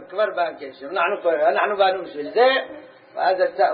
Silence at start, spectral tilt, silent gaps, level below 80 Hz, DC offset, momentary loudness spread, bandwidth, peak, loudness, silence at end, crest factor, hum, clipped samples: 0 s; -7.5 dB/octave; none; -76 dBFS; under 0.1%; 15 LU; 5 kHz; -4 dBFS; -21 LUFS; 0 s; 16 dB; none; under 0.1%